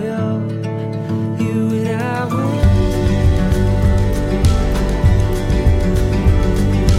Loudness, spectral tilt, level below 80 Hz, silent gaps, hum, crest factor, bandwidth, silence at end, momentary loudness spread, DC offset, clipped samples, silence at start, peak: -17 LUFS; -7.5 dB/octave; -18 dBFS; none; none; 14 dB; 15 kHz; 0 s; 6 LU; under 0.1%; under 0.1%; 0 s; 0 dBFS